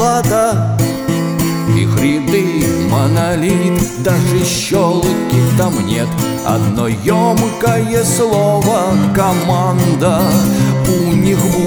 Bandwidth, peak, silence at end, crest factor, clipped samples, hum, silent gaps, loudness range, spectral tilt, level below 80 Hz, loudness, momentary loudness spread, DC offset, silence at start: over 20 kHz; -2 dBFS; 0 s; 12 dB; under 0.1%; none; none; 1 LU; -6 dB/octave; -36 dBFS; -13 LUFS; 3 LU; under 0.1%; 0 s